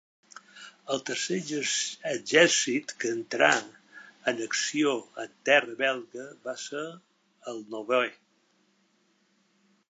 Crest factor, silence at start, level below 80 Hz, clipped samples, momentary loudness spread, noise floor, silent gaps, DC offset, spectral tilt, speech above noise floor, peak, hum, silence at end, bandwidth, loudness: 24 dB; 0.55 s; -86 dBFS; under 0.1%; 18 LU; -69 dBFS; none; under 0.1%; -2 dB/octave; 41 dB; -6 dBFS; none; 1.75 s; 9.4 kHz; -27 LUFS